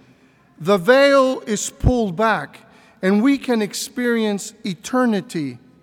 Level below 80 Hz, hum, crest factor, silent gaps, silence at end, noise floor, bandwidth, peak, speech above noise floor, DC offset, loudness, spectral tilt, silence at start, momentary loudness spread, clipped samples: -36 dBFS; none; 18 dB; none; 0.25 s; -53 dBFS; 17.5 kHz; -2 dBFS; 35 dB; under 0.1%; -19 LUFS; -5 dB/octave; 0.6 s; 14 LU; under 0.1%